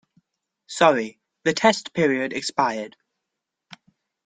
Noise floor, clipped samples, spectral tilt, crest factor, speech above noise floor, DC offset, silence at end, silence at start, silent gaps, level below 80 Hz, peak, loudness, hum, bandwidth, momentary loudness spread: -83 dBFS; under 0.1%; -4 dB/octave; 22 dB; 62 dB; under 0.1%; 1.4 s; 0.7 s; none; -68 dBFS; -2 dBFS; -22 LUFS; none; 9.6 kHz; 15 LU